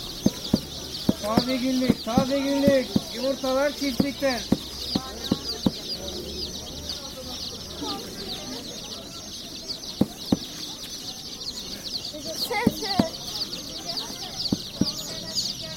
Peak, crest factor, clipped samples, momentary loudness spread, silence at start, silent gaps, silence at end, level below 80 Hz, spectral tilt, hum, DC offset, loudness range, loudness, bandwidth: -4 dBFS; 24 dB; under 0.1%; 10 LU; 0 s; none; 0 s; -48 dBFS; -4 dB/octave; none; under 0.1%; 8 LU; -27 LUFS; 16.5 kHz